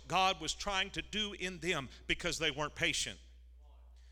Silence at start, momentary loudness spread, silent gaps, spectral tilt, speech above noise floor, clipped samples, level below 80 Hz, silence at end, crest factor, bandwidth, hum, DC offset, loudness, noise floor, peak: 0 s; 6 LU; none; -2.5 dB/octave; 21 dB; under 0.1%; -54 dBFS; 0 s; 20 dB; 18 kHz; none; under 0.1%; -35 LUFS; -57 dBFS; -16 dBFS